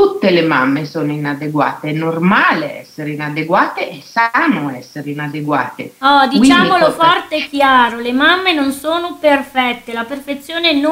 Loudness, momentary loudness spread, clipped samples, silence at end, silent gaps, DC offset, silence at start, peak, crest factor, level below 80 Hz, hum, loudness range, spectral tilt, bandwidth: -14 LUFS; 12 LU; under 0.1%; 0 s; none; under 0.1%; 0 s; 0 dBFS; 14 dB; -52 dBFS; none; 5 LU; -5 dB/octave; 16 kHz